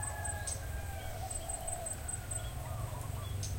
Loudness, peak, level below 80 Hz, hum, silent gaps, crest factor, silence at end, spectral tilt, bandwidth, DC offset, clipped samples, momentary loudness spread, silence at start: -40 LUFS; -24 dBFS; -46 dBFS; none; none; 16 dB; 0 s; -3.5 dB/octave; 16.5 kHz; under 0.1%; under 0.1%; 4 LU; 0 s